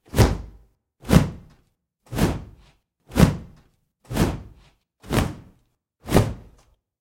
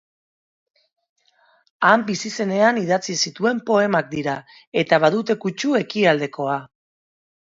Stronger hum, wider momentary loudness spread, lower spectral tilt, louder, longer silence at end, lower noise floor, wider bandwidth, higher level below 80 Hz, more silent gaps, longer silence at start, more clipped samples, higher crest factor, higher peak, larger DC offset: neither; first, 22 LU vs 9 LU; first, -6 dB/octave vs -4.5 dB/octave; second, -23 LUFS vs -20 LUFS; second, 0.6 s vs 0.9 s; first, -66 dBFS vs -60 dBFS; first, 16.5 kHz vs 7.8 kHz; first, -34 dBFS vs -66 dBFS; second, none vs 4.67-4.72 s; second, 0.15 s vs 1.8 s; neither; about the same, 22 dB vs 22 dB; about the same, -2 dBFS vs 0 dBFS; neither